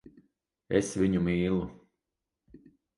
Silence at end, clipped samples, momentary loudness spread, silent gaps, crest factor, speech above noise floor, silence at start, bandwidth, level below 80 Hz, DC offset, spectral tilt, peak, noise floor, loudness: 1.25 s; under 0.1%; 6 LU; none; 22 dB; 60 dB; 0.7 s; 11.5 kHz; -52 dBFS; under 0.1%; -6.5 dB/octave; -10 dBFS; -87 dBFS; -29 LUFS